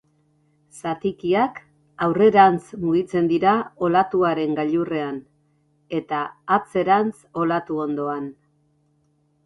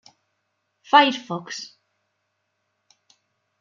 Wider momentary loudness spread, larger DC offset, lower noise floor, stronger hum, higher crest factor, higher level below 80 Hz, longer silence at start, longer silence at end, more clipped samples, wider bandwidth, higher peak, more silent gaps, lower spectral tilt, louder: second, 13 LU vs 18 LU; neither; second, -65 dBFS vs -75 dBFS; neither; about the same, 20 dB vs 24 dB; first, -60 dBFS vs -82 dBFS; second, 0.75 s vs 0.95 s; second, 1.15 s vs 1.95 s; neither; first, 11.5 kHz vs 7.4 kHz; about the same, -2 dBFS vs -2 dBFS; neither; first, -7 dB/octave vs -3.5 dB/octave; about the same, -21 LUFS vs -19 LUFS